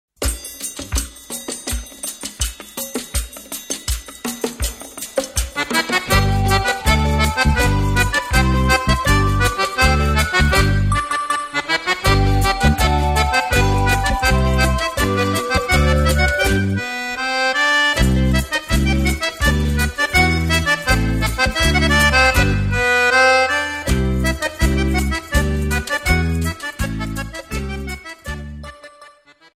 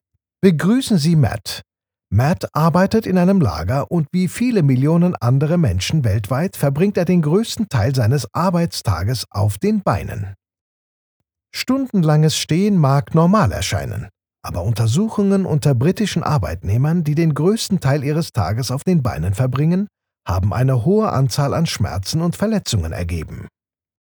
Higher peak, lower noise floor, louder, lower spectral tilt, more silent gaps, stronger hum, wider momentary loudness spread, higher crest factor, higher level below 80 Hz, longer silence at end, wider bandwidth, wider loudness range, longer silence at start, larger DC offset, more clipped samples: about the same, -2 dBFS vs 0 dBFS; second, -47 dBFS vs under -90 dBFS; about the same, -17 LUFS vs -18 LUFS; second, -4 dB/octave vs -6.5 dB/octave; second, none vs 10.61-11.20 s; neither; first, 12 LU vs 9 LU; about the same, 16 dB vs 18 dB; first, -24 dBFS vs -40 dBFS; second, 0.5 s vs 0.65 s; second, 16 kHz vs over 20 kHz; first, 10 LU vs 3 LU; second, 0.2 s vs 0.45 s; neither; neither